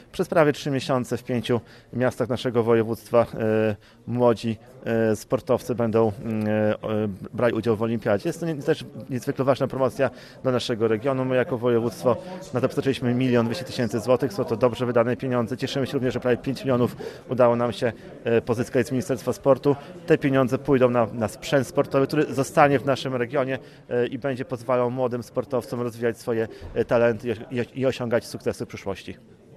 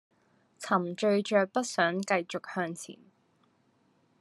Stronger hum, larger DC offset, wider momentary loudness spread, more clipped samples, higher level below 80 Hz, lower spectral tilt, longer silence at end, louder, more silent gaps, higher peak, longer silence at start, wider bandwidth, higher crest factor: neither; neither; second, 9 LU vs 13 LU; neither; first, -56 dBFS vs -86 dBFS; first, -6.5 dB/octave vs -4.5 dB/octave; second, 0.4 s vs 1.25 s; first, -24 LUFS vs -29 LUFS; neither; first, -2 dBFS vs -10 dBFS; second, 0.15 s vs 0.6 s; first, 14 kHz vs 12.5 kHz; about the same, 22 dB vs 20 dB